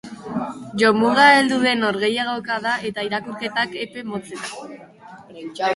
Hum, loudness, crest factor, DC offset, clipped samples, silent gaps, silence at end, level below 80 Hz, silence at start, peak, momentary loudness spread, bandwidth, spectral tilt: none; -19 LUFS; 20 dB; under 0.1%; under 0.1%; none; 0 s; -62 dBFS; 0.05 s; 0 dBFS; 18 LU; 11.5 kHz; -4 dB/octave